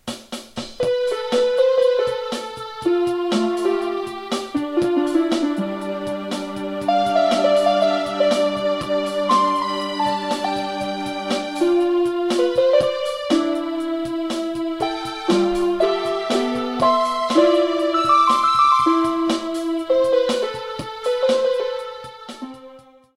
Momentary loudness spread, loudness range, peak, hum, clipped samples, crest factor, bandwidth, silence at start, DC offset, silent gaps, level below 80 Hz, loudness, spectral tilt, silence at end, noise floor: 10 LU; 5 LU; -4 dBFS; none; under 0.1%; 16 dB; 13 kHz; 0.05 s; under 0.1%; none; -54 dBFS; -20 LUFS; -4.5 dB/octave; 0.35 s; -45 dBFS